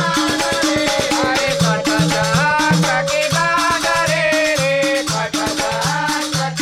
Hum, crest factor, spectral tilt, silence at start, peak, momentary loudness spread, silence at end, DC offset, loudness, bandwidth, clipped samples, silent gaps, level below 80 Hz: none; 12 dB; -3.5 dB/octave; 0 s; -4 dBFS; 4 LU; 0 s; under 0.1%; -16 LUFS; 16 kHz; under 0.1%; none; -44 dBFS